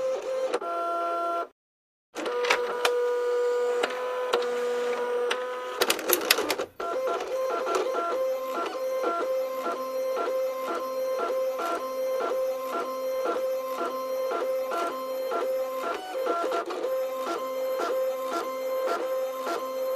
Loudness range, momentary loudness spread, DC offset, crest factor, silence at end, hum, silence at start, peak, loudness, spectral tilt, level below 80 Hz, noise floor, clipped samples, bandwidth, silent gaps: 3 LU; 6 LU; under 0.1%; 28 dB; 0 s; none; 0 s; 0 dBFS; -28 LUFS; -1 dB/octave; -74 dBFS; under -90 dBFS; under 0.1%; 15.5 kHz; 1.52-2.13 s